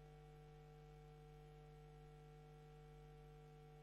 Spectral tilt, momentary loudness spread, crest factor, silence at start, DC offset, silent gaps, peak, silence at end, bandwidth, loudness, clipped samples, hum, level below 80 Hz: -7 dB/octave; 0 LU; 10 dB; 0 s; under 0.1%; none; -52 dBFS; 0 s; 12.5 kHz; -63 LUFS; under 0.1%; 50 Hz at -65 dBFS; -68 dBFS